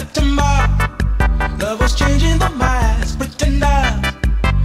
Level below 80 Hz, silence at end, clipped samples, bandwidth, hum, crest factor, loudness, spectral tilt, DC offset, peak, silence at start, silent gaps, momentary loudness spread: -16 dBFS; 0 s; under 0.1%; 13 kHz; none; 12 dB; -17 LUFS; -5 dB/octave; under 0.1%; -2 dBFS; 0 s; none; 4 LU